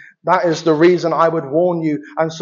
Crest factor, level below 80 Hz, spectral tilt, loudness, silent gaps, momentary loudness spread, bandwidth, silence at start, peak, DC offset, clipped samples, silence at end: 16 dB; -72 dBFS; -5.5 dB/octave; -16 LUFS; none; 8 LU; 7.4 kHz; 0.25 s; 0 dBFS; under 0.1%; under 0.1%; 0 s